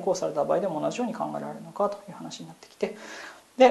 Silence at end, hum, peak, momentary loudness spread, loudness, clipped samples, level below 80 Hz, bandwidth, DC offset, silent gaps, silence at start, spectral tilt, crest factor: 0 s; none; -6 dBFS; 15 LU; -29 LUFS; under 0.1%; -76 dBFS; 12.5 kHz; under 0.1%; none; 0 s; -5 dB/octave; 22 dB